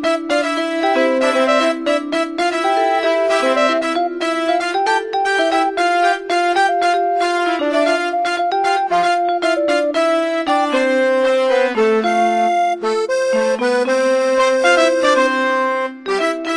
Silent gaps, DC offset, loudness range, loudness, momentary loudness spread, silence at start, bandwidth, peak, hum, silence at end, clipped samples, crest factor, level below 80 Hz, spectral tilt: none; under 0.1%; 1 LU; -16 LUFS; 4 LU; 0 s; 10.5 kHz; -2 dBFS; none; 0 s; under 0.1%; 14 dB; -58 dBFS; -2.5 dB/octave